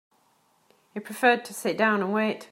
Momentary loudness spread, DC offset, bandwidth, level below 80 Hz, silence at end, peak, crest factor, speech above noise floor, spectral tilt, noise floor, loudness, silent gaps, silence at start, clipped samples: 16 LU; under 0.1%; 16 kHz; -80 dBFS; 0.05 s; -6 dBFS; 20 dB; 41 dB; -4.5 dB/octave; -66 dBFS; -24 LUFS; none; 0.95 s; under 0.1%